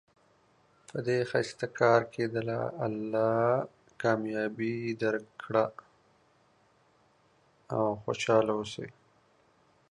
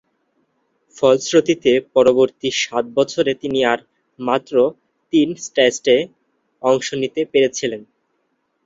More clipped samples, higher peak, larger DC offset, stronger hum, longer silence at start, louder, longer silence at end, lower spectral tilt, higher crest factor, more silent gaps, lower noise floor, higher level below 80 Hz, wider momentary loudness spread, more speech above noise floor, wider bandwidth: neither; second, -10 dBFS vs -2 dBFS; neither; neither; about the same, 0.95 s vs 0.95 s; second, -30 LUFS vs -18 LUFS; first, 1 s vs 0.85 s; first, -6 dB/octave vs -4 dB/octave; about the same, 22 dB vs 18 dB; neither; about the same, -67 dBFS vs -69 dBFS; second, -70 dBFS vs -60 dBFS; about the same, 10 LU vs 8 LU; second, 37 dB vs 52 dB; first, 11 kHz vs 7.8 kHz